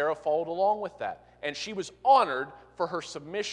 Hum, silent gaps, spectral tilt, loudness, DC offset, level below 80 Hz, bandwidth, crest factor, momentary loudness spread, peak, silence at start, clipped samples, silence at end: 60 Hz at -65 dBFS; none; -3.5 dB/octave; -29 LUFS; under 0.1%; -68 dBFS; 10.5 kHz; 20 dB; 14 LU; -10 dBFS; 0 s; under 0.1%; 0 s